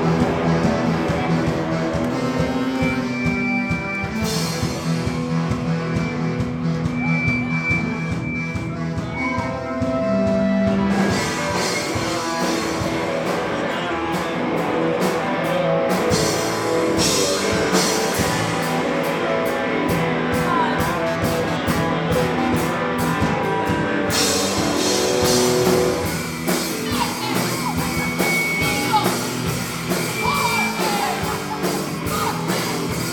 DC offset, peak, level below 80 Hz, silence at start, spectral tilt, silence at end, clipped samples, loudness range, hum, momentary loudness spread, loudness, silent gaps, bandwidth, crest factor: under 0.1%; -4 dBFS; -42 dBFS; 0 s; -4.5 dB/octave; 0 s; under 0.1%; 3 LU; none; 5 LU; -20 LUFS; none; 19.5 kHz; 16 dB